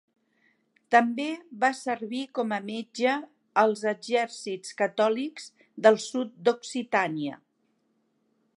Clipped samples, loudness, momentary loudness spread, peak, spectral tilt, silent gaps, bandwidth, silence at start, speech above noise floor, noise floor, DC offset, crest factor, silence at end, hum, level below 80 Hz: under 0.1%; -27 LUFS; 12 LU; -4 dBFS; -4 dB/octave; none; 11.5 kHz; 0.9 s; 46 dB; -72 dBFS; under 0.1%; 24 dB; 1.25 s; none; -84 dBFS